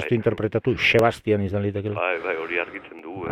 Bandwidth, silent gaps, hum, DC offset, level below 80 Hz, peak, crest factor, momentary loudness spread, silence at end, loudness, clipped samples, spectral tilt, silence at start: 16 kHz; none; none; under 0.1%; -52 dBFS; -4 dBFS; 20 dB; 14 LU; 0 s; -23 LUFS; under 0.1%; -6.5 dB/octave; 0 s